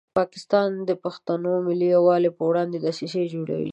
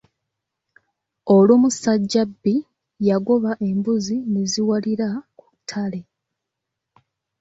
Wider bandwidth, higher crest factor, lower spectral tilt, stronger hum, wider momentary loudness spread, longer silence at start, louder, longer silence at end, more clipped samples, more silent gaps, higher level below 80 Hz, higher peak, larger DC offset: about the same, 8.6 kHz vs 8 kHz; about the same, 16 dB vs 18 dB; about the same, -7 dB/octave vs -6 dB/octave; neither; second, 9 LU vs 15 LU; second, 0.15 s vs 1.25 s; second, -23 LUFS vs -20 LUFS; second, 0 s vs 1.4 s; neither; neither; second, -68 dBFS vs -62 dBFS; about the same, -6 dBFS vs -4 dBFS; neither